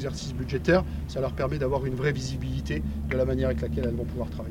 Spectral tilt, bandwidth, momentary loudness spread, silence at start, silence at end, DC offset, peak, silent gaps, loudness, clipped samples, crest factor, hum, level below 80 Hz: -7 dB/octave; 16 kHz; 8 LU; 0 s; 0 s; under 0.1%; -10 dBFS; none; -28 LUFS; under 0.1%; 18 dB; none; -36 dBFS